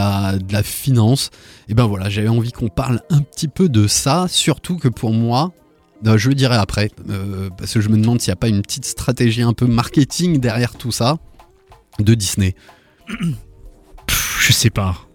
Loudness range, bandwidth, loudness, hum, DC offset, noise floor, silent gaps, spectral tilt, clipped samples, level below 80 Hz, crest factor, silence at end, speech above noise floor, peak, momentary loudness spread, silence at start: 3 LU; 18.5 kHz; -17 LUFS; none; under 0.1%; -48 dBFS; none; -5 dB/octave; under 0.1%; -38 dBFS; 14 dB; 0.15 s; 32 dB; -2 dBFS; 10 LU; 0 s